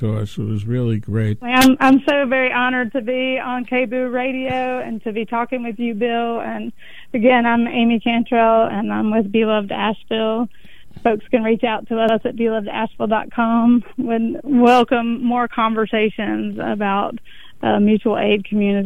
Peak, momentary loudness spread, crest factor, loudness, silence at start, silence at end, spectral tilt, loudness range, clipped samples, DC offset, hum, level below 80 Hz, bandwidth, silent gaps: 0 dBFS; 10 LU; 18 dB; -18 LUFS; 0 s; 0 s; -6 dB/octave; 5 LU; under 0.1%; 2%; none; -48 dBFS; 16 kHz; none